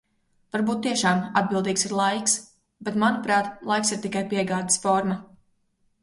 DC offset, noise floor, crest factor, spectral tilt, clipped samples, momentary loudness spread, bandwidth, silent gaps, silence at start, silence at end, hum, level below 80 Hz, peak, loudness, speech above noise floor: under 0.1%; -68 dBFS; 18 dB; -3.5 dB/octave; under 0.1%; 7 LU; 11.5 kHz; none; 0.55 s; 0.75 s; none; -64 dBFS; -6 dBFS; -24 LUFS; 44 dB